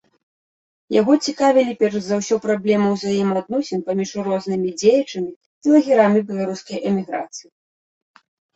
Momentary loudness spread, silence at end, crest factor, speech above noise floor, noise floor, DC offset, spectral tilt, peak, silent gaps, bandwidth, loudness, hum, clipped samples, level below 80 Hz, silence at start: 11 LU; 1.15 s; 18 dB; over 72 dB; under -90 dBFS; under 0.1%; -5.5 dB/octave; -2 dBFS; 5.36-5.61 s; 8.2 kHz; -19 LUFS; none; under 0.1%; -64 dBFS; 0.9 s